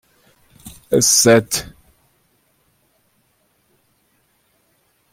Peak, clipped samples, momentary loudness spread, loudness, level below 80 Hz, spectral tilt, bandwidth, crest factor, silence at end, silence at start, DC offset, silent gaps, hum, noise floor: -2 dBFS; under 0.1%; 27 LU; -14 LUFS; -54 dBFS; -3 dB/octave; 16.5 kHz; 20 dB; 3.45 s; 0.65 s; under 0.1%; none; none; -63 dBFS